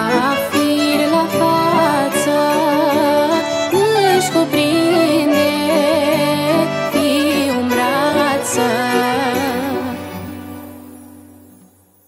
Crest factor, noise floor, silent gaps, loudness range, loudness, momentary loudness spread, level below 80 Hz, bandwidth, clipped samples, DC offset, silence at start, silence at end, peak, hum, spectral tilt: 14 dB; -49 dBFS; none; 4 LU; -15 LUFS; 7 LU; -60 dBFS; 16 kHz; under 0.1%; under 0.1%; 0 s; 0.9 s; 0 dBFS; none; -4 dB/octave